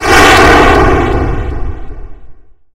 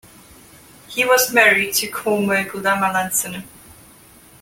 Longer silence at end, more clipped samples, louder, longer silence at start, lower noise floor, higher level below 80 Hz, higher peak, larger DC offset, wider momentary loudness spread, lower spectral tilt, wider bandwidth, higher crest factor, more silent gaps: second, 0.4 s vs 0.95 s; first, 1% vs under 0.1%; first, -7 LUFS vs -17 LUFS; second, 0 s vs 0.9 s; second, -30 dBFS vs -47 dBFS; first, -16 dBFS vs -56 dBFS; about the same, 0 dBFS vs -2 dBFS; neither; first, 20 LU vs 11 LU; first, -4.5 dB/octave vs -2.5 dB/octave; about the same, 17 kHz vs 17 kHz; second, 8 dB vs 20 dB; neither